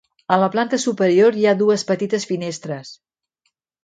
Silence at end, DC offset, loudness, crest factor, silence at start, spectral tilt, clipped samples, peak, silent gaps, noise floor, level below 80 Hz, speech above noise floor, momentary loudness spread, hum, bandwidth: 0.9 s; under 0.1%; -18 LUFS; 18 dB; 0.3 s; -5 dB/octave; under 0.1%; 0 dBFS; none; -72 dBFS; -68 dBFS; 54 dB; 13 LU; none; 9.4 kHz